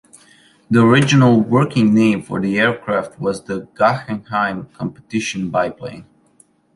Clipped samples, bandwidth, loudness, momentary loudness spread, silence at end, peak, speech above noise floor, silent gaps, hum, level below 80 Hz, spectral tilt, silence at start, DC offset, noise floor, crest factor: under 0.1%; 11.5 kHz; -16 LUFS; 14 LU; 0.7 s; -2 dBFS; 38 dB; none; none; -54 dBFS; -6.5 dB/octave; 0.7 s; under 0.1%; -55 dBFS; 16 dB